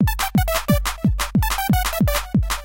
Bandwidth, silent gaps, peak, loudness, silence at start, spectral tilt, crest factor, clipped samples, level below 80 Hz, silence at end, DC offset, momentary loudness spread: 17 kHz; none; -6 dBFS; -20 LUFS; 0 s; -5 dB/octave; 14 dB; under 0.1%; -26 dBFS; 0 s; under 0.1%; 3 LU